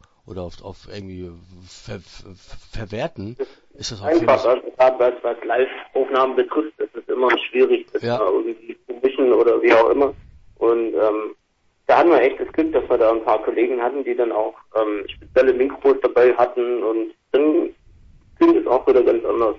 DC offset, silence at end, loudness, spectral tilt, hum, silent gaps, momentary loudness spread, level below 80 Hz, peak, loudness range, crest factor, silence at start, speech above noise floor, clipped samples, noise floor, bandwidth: under 0.1%; 0 s; -19 LUFS; -6 dB/octave; none; none; 18 LU; -50 dBFS; -2 dBFS; 5 LU; 18 dB; 0.3 s; 46 dB; under 0.1%; -64 dBFS; 7.8 kHz